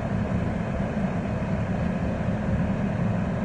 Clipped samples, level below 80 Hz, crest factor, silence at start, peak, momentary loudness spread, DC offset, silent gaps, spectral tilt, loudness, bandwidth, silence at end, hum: under 0.1%; -36 dBFS; 12 dB; 0 s; -14 dBFS; 2 LU; under 0.1%; none; -8.5 dB/octave; -27 LUFS; 9.4 kHz; 0 s; none